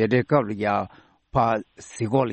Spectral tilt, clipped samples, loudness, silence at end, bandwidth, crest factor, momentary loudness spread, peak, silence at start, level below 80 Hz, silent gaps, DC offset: -7 dB/octave; under 0.1%; -24 LUFS; 0 s; 8.8 kHz; 16 dB; 12 LU; -6 dBFS; 0 s; -52 dBFS; none; under 0.1%